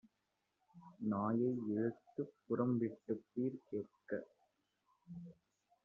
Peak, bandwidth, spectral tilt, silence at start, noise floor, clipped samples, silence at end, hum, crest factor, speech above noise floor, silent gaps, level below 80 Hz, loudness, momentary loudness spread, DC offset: -24 dBFS; 2.6 kHz; -10.5 dB/octave; 0.75 s; -86 dBFS; under 0.1%; 0.5 s; none; 20 dB; 45 dB; none; -84 dBFS; -41 LUFS; 17 LU; under 0.1%